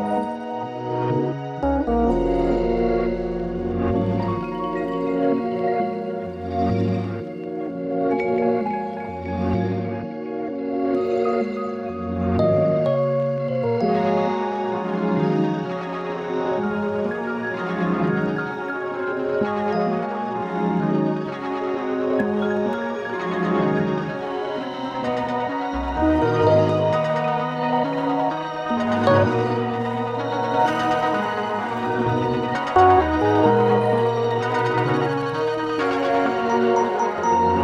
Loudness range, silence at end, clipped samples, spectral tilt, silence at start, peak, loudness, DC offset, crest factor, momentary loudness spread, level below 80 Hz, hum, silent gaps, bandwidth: 5 LU; 0 s; under 0.1%; -7.5 dB/octave; 0 s; -4 dBFS; -22 LUFS; under 0.1%; 18 dB; 9 LU; -42 dBFS; none; none; 10 kHz